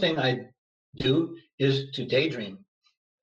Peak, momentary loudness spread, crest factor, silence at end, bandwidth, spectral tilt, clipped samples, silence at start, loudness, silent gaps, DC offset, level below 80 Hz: -12 dBFS; 10 LU; 18 dB; 0.65 s; 7.6 kHz; -6.5 dB/octave; under 0.1%; 0 s; -27 LUFS; 0.58-0.93 s, 1.53-1.58 s; under 0.1%; -60 dBFS